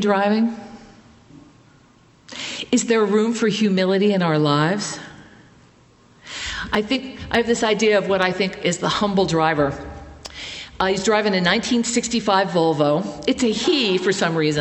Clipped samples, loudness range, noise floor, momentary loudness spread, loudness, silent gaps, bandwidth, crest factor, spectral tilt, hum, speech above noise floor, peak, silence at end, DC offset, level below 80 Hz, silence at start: under 0.1%; 4 LU; -53 dBFS; 14 LU; -19 LUFS; none; 8.6 kHz; 18 dB; -4.5 dB/octave; none; 34 dB; -2 dBFS; 0 s; under 0.1%; -48 dBFS; 0 s